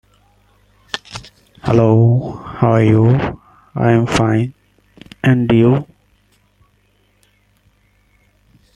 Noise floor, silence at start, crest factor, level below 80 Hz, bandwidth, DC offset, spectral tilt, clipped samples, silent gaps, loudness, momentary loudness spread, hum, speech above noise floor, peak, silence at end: -58 dBFS; 0.95 s; 16 dB; -44 dBFS; 9.8 kHz; under 0.1%; -7.5 dB/octave; under 0.1%; none; -14 LUFS; 17 LU; 50 Hz at -50 dBFS; 45 dB; -2 dBFS; 2.95 s